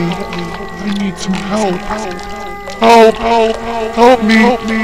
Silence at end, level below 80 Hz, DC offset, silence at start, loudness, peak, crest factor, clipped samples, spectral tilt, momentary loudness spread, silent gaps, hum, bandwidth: 0 s; -34 dBFS; 2%; 0 s; -12 LUFS; 0 dBFS; 12 dB; 0.9%; -5 dB/octave; 16 LU; none; none; 15.5 kHz